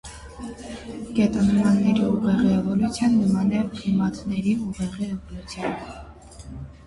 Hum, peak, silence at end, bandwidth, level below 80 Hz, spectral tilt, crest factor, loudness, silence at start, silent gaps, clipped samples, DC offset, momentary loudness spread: none; -8 dBFS; 0.05 s; 11.5 kHz; -44 dBFS; -7 dB/octave; 14 dB; -22 LUFS; 0.05 s; none; under 0.1%; under 0.1%; 19 LU